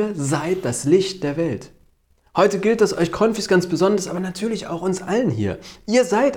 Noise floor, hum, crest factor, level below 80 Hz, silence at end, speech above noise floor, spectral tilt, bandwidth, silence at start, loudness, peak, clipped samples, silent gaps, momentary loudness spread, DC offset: -59 dBFS; none; 16 dB; -52 dBFS; 0 s; 39 dB; -5.5 dB/octave; 18 kHz; 0 s; -20 LUFS; -4 dBFS; under 0.1%; none; 8 LU; under 0.1%